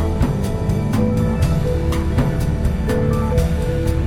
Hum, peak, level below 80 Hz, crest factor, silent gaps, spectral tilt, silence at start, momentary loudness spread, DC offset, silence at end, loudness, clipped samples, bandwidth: none; -4 dBFS; -22 dBFS; 12 dB; none; -7.5 dB/octave; 0 s; 2 LU; under 0.1%; 0 s; -19 LUFS; under 0.1%; 16 kHz